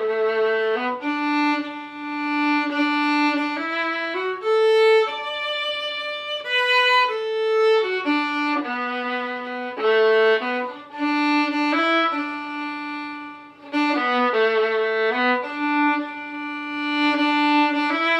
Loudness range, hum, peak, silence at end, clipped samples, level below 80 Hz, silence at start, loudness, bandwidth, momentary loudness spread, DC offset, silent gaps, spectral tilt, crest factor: 3 LU; none; -8 dBFS; 0 s; under 0.1%; -76 dBFS; 0 s; -21 LUFS; 9 kHz; 11 LU; under 0.1%; none; -3 dB/octave; 14 dB